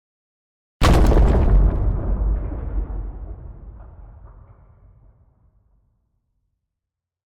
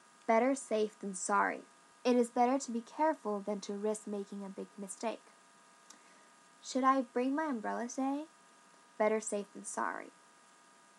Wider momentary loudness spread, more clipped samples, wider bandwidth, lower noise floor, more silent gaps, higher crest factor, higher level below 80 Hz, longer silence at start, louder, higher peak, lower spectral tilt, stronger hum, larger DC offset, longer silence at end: first, 24 LU vs 14 LU; neither; about the same, 12 kHz vs 12 kHz; first, -85 dBFS vs -63 dBFS; neither; second, 14 dB vs 20 dB; first, -22 dBFS vs under -90 dBFS; first, 0.8 s vs 0.3 s; first, -20 LUFS vs -35 LUFS; first, -8 dBFS vs -16 dBFS; first, -7 dB/octave vs -4 dB/octave; neither; neither; first, 3.1 s vs 0.9 s